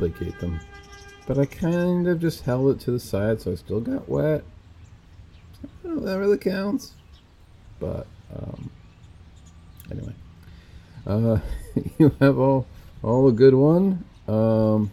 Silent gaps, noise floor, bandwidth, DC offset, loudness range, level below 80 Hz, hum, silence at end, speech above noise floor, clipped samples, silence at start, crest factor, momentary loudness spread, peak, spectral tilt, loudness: none; -50 dBFS; 15 kHz; under 0.1%; 18 LU; -44 dBFS; none; 0 s; 29 dB; under 0.1%; 0 s; 20 dB; 21 LU; -2 dBFS; -8.5 dB/octave; -22 LUFS